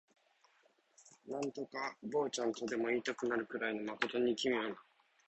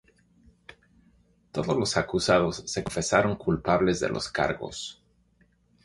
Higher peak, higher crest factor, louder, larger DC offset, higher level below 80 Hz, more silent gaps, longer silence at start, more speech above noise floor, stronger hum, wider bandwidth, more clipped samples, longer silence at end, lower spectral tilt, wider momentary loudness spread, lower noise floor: second, -16 dBFS vs -6 dBFS; about the same, 24 dB vs 22 dB; second, -38 LUFS vs -26 LUFS; neither; second, -80 dBFS vs -50 dBFS; neither; second, 1 s vs 1.55 s; second, 35 dB vs 39 dB; neither; second, 8.2 kHz vs 11.5 kHz; neither; second, 0.45 s vs 0.9 s; about the same, -3.5 dB/octave vs -4.5 dB/octave; second, 8 LU vs 11 LU; first, -73 dBFS vs -65 dBFS